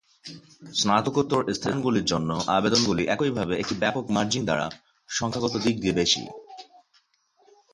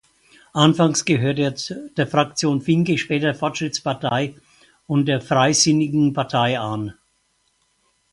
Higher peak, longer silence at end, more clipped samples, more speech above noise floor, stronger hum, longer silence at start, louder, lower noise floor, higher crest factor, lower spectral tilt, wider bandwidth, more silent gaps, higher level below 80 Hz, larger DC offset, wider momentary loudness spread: second, -6 dBFS vs 0 dBFS; about the same, 1.1 s vs 1.2 s; neither; second, 41 dB vs 47 dB; neither; second, 0.25 s vs 0.55 s; second, -25 LUFS vs -20 LUFS; about the same, -66 dBFS vs -66 dBFS; about the same, 20 dB vs 20 dB; about the same, -4 dB/octave vs -4.5 dB/octave; about the same, 11.5 kHz vs 11.5 kHz; neither; about the same, -54 dBFS vs -58 dBFS; neither; first, 20 LU vs 11 LU